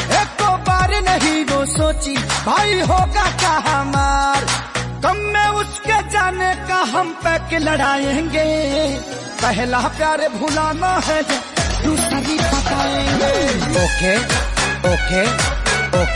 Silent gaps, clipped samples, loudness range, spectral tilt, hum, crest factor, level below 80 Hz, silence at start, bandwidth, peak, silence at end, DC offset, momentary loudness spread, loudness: none; under 0.1%; 2 LU; -4 dB/octave; none; 14 dB; -28 dBFS; 0 s; 11.5 kHz; -2 dBFS; 0 s; under 0.1%; 4 LU; -17 LUFS